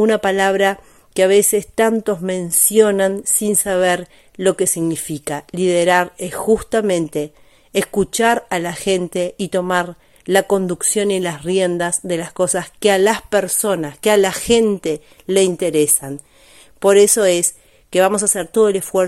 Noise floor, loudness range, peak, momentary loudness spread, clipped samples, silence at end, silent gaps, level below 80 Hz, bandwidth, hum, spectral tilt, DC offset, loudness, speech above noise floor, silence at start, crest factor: -46 dBFS; 4 LU; 0 dBFS; 10 LU; under 0.1%; 0 s; none; -50 dBFS; 16 kHz; none; -3.5 dB/octave; under 0.1%; -16 LUFS; 30 dB; 0 s; 16 dB